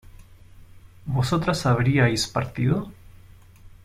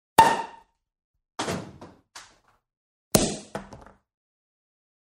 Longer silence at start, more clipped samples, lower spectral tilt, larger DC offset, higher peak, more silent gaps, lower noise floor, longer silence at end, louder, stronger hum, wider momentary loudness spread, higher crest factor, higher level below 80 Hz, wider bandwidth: about the same, 0.3 s vs 0.2 s; neither; first, -5.5 dB/octave vs -3.5 dB/octave; neither; second, -8 dBFS vs 0 dBFS; second, none vs 1.04-1.14 s, 2.77-3.11 s; second, -48 dBFS vs -59 dBFS; second, 0.15 s vs 1.35 s; about the same, -23 LUFS vs -25 LUFS; neither; second, 9 LU vs 27 LU; second, 18 dB vs 28 dB; first, -46 dBFS vs -52 dBFS; about the same, 15.5 kHz vs 14.5 kHz